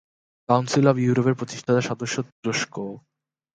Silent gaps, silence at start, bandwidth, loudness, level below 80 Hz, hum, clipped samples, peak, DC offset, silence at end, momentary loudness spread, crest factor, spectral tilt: 2.32-2.43 s; 0.5 s; 9.4 kHz; -23 LUFS; -64 dBFS; none; under 0.1%; -4 dBFS; under 0.1%; 0.55 s; 12 LU; 20 dB; -5.5 dB/octave